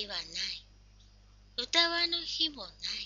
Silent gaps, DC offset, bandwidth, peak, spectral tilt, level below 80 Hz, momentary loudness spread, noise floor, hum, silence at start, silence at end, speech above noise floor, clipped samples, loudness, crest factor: none; under 0.1%; 7.6 kHz; -10 dBFS; 1.5 dB/octave; -60 dBFS; 13 LU; -58 dBFS; 50 Hz at -60 dBFS; 0 s; 0 s; 26 dB; under 0.1%; -31 LUFS; 24 dB